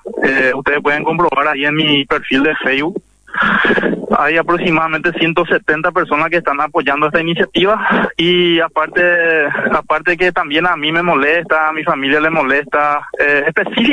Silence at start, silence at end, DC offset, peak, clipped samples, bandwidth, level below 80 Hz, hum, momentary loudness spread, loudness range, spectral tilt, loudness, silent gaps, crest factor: 0.05 s; 0 s; under 0.1%; 0 dBFS; under 0.1%; 10 kHz; -46 dBFS; none; 3 LU; 1 LU; -6 dB/octave; -13 LUFS; none; 12 dB